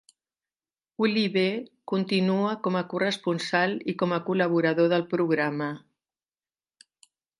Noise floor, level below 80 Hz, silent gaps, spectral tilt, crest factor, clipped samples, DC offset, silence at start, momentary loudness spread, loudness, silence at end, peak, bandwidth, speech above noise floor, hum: under -90 dBFS; -76 dBFS; none; -6.5 dB/octave; 18 dB; under 0.1%; under 0.1%; 1 s; 8 LU; -26 LUFS; 1.6 s; -8 dBFS; 11.5 kHz; over 65 dB; none